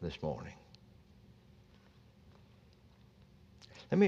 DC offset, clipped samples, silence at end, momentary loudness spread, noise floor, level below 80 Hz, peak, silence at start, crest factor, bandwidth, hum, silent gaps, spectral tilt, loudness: under 0.1%; under 0.1%; 0 s; 22 LU; -62 dBFS; -64 dBFS; -16 dBFS; 0 s; 24 dB; 7.4 kHz; none; none; -8 dB/octave; -42 LUFS